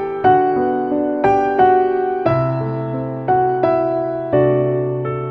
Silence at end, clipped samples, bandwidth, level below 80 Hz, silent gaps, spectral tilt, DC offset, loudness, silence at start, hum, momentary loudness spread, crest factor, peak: 0 s; under 0.1%; 6 kHz; -48 dBFS; none; -9.5 dB/octave; under 0.1%; -17 LUFS; 0 s; none; 8 LU; 14 dB; -2 dBFS